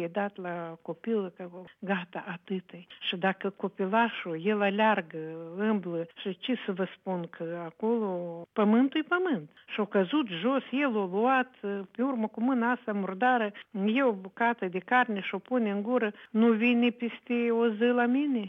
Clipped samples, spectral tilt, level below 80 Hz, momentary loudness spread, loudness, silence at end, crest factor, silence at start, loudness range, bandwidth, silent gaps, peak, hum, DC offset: under 0.1%; -8.5 dB/octave; -86 dBFS; 12 LU; -29 LUFS; 0 s; 16 dB; 0 s; 5 LU; 3.9 kHz; none; -12 dBFS; none; under 0.1%